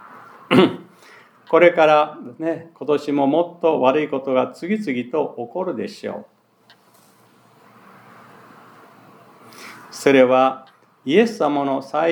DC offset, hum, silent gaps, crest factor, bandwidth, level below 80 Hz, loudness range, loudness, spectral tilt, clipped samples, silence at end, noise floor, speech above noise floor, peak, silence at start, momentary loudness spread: under 0.1%; none; none; 20 dB; 19.5 kHz; -78 dBFS; 13 LU; -19 LUFS; -6 dB/octave; under 0.1%; 0 s; -55 dBFS; 37 dB; 0 dBFS; 0.15 s; 17 LU